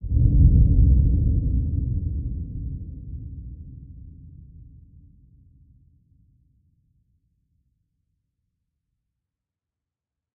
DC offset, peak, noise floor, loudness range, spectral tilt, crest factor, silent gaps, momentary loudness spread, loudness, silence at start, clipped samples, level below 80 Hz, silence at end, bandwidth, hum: under 0.1%; -4 dBFS; -88 dBFS; 25 LU; -20.5 dB/octave; 20 dB; none; 25 LU; -22 LUFS; 0 s; under 0.1%; -26 dBFS; 5.9 s; 0.7 kHz; none